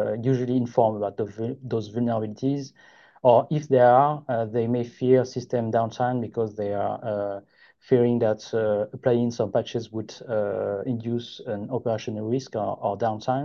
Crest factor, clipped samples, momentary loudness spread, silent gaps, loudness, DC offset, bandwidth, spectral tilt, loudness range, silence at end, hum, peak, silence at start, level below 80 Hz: 20 dB; under 0.1%; 10 LU; none; -25 LUFS; under 0.1%; 7 kHz; -7.5 dB/octave; 6 LU; 0 s; none; -4 dBFS; 0 s; -62 dBFS